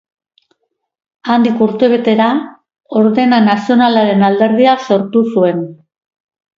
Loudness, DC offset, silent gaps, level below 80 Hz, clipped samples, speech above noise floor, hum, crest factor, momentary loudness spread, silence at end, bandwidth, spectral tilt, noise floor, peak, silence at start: -12 LUFS; under 0.1%; none; -60 dBFS; under 0.1%; 52 dB; none; 12 dB; 9 LU; 0.85 s; 7.2 kHz; -7 dB/octave; -63 dBFS; 0 dBFS; 1.25 s